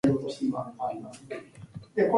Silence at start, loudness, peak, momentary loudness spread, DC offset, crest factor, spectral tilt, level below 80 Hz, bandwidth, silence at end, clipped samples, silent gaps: 0.05 s; -32 LUFS; -10 dBFS; 15 LU; under 0.1%; 18 dB; -7.5 dB/octave; -62 dBFS; 11.5 kHz; 0 s; under 0.1%; none